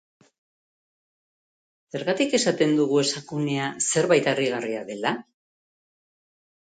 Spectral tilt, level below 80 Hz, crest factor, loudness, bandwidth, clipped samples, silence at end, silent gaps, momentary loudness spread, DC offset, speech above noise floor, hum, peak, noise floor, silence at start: -4 dB/octave; -70 dBFS; 20 dB; -23 LUFS; 9.4 kHz; under 0.1%; 1.45 s; none; 10 LU; under 0.1%; over 67 dB; none; -6 dBFS; under -90 dBFS; 1.95 s